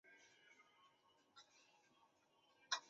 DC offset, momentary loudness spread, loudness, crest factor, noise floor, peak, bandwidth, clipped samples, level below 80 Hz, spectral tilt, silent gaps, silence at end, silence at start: under 0.1%; 11 LU; -50 LUFS; 30 dB; -78 dBFS; -28 dBFS; 7.6 kHz; under 0.1%; under -90 dBFS; 4 dB/octave; none; 0 s; 0.05 s